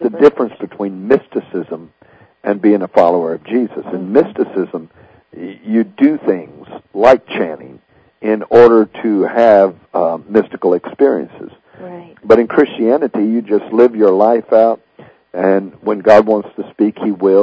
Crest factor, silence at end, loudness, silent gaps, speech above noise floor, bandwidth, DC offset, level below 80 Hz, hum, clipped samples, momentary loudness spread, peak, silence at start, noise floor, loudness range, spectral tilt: 14 dB; 0 s; -13 LUFS; none; 35 dB; 8 kHz; under 0.1%; -54 dBFS; none; 0.9%; 17 LU; 0 dBFS; 0 s; -47 dBFS; 4 LU; -8 dB/octave